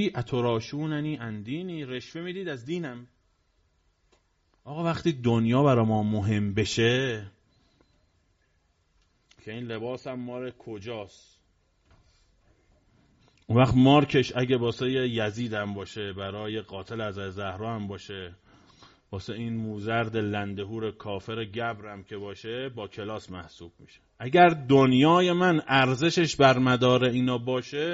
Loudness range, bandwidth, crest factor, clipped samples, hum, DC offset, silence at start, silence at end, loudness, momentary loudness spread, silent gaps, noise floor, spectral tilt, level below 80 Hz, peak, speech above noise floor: 17 LU; 7.6 kHz; 22 dB; under 0.1%; none; under 0.1%; 0 s; 0 s; -26 LUFS; 19 LU; none; -69 dBFS; -5 dB/octave; -58 dBFS; -4 dBFS; 43 dB